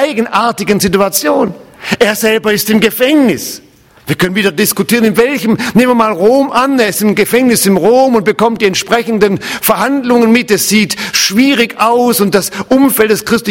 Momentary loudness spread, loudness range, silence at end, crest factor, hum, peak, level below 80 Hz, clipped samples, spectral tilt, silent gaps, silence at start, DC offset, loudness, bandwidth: 4 LU; 2 LU; 0 s; 10 dB; none; 0 dBFS; -46 dBFS; 0.3%; -4 dB/octave; none; 0 s; under 0.1%; -10 LUFS; 17.5 kHz